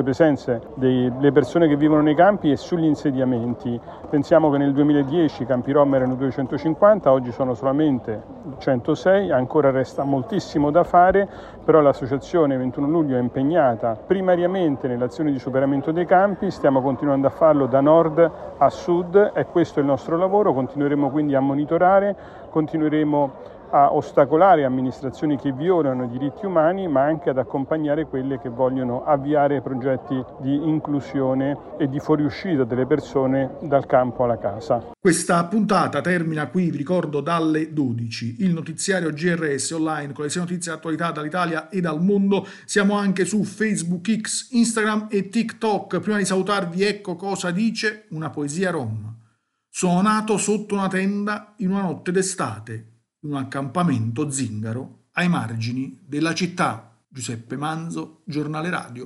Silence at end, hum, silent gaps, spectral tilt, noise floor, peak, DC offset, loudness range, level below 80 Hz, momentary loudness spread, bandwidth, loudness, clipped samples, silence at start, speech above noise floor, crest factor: 0 s; none; none; -6 dB/octave; -64 dBFS; -4 dBFS; under 0.1%; 6 LU; -54 dBFS; 10 LU; 12 kHz; -21 LUFS; under 0.1%; 0 s; 43 dB; 18 dB